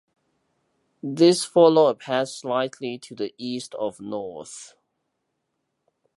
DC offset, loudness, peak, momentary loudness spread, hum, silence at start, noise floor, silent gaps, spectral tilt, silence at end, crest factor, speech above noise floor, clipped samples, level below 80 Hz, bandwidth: under 0.1%; -22 LUFS; -4 dBFS; 19 LU; none; 1.05 s; -77 dBFS; none; -5 dB/octave; 1.5 s; 22 dB; 55 dB; under 0.1%; -74 dBFS; 11.5 kHz